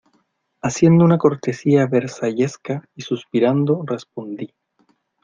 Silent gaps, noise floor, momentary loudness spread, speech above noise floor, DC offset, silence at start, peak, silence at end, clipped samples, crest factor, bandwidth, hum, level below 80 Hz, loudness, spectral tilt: none; -65 dBFS; 17 LU; 47 dB; under 0.1%; 0.65 s; -2 dBFS; 0.8 s; under 0.1%; 18 dB; 7.6 kHz; none; -58 dBFS; -19 LUFS; -7 dB/octave